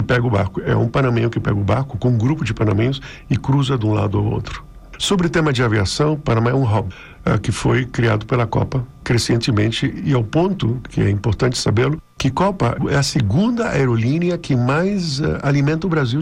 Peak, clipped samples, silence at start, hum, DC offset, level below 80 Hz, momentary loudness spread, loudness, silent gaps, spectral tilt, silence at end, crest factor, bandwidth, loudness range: -8 dBFS; under 0.1%; 0 s; none; under 0.1%; -38 dBFS; 5 LU; -18 LUFS; none; -6 dB/octave; 0 s; 10 dB; 12 kHz; 1 LU